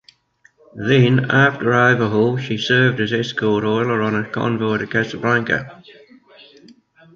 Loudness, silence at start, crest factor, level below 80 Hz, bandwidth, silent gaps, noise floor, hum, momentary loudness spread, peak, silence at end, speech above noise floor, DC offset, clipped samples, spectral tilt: -17 LUFS; 0.75 s; 16 dB; -56 dBFS; 7.4 kHz; none; -57 dBFS; none; 7 LU; -2 dBFS; 1.25 s; 39 dB; under 0.1%; under 0.1%; -6.5 dB/octave